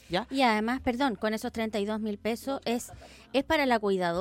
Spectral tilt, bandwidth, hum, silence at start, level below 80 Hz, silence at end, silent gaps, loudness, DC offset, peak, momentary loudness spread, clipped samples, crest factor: -4.5 dB/octave; 16.5 kHz; none; 0.1 s; -54 dBFS; 0 s; none; -29 LUFS; under 0.1%; -12 dBFS; 7 LU; under 0.1%; 18 dB